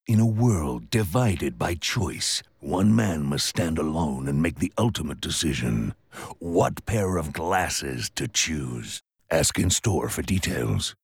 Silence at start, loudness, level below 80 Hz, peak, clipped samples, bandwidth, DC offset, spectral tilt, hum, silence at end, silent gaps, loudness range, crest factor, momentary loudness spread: 0.1 s; -25 LUFS; -44 dBFS; -10 dBFS; under 0.1%; 18.5 kHz; under 0.1%; -4.5 dB/octave; none; 0.1 s; none; 2 LU; 16 dB; 8 LU